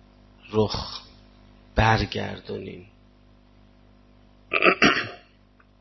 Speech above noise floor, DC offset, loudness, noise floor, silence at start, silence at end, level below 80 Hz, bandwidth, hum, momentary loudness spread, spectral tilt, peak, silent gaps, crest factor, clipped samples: 32 dB; under 0.1%; -23 LUFS; -57 dBFS; 0.5 s; 0.6 s; -42 dBFS; 6.2 kHz; 50 Hz at -50 dBFS; 18 LU; -5.5 dB/octave; -4 dBFS; none; 24 dB; under 0.1%